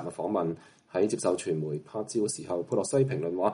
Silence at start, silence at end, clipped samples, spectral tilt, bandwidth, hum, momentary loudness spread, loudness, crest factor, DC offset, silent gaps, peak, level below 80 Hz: 0 s; 0 s; under 0.1%; -6 dB/octave; 11.5 kHz; none; 7 LU; -30 LUFS; 16 dB; under 0.1%; none; -12 dBFS; -72 dBFS